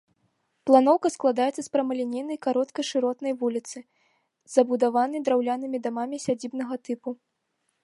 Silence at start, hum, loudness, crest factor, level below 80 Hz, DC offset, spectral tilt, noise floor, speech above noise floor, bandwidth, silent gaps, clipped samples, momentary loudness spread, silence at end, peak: 0.65 s; none; -25 LUFS; 22 dB; -78 dBFS; under 0.1%; -4.5 dB/octave; -76 dBFS; 51 dB; 11.5 kHz; none; under 0.1%; 13 LU; 0.7 s; -4 dBFS